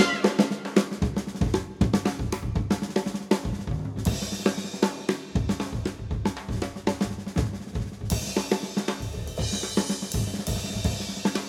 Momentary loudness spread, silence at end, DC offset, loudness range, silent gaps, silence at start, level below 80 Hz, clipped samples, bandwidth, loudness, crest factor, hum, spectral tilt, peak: 7 LU; 0 s; under 0.1%; 3 LU; none; 0 s; -38 dBFS; under 0.1%; 17 kHz; -28 LUFS; 22 dB; none; -5 dB/octave; -4 dBFS